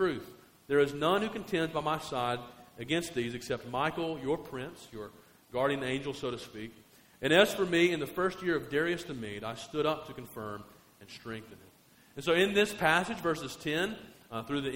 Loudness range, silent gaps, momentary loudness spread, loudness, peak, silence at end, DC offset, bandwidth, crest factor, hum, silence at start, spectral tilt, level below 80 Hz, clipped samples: 6 LU; none; 18 LU; -31 LUFS; -8 dBFS; 0 s; under 0.1%; 16 kHz; 24 dB; none; 0 s; -4.5 dB/octave; -62 dBFS; under 0.1%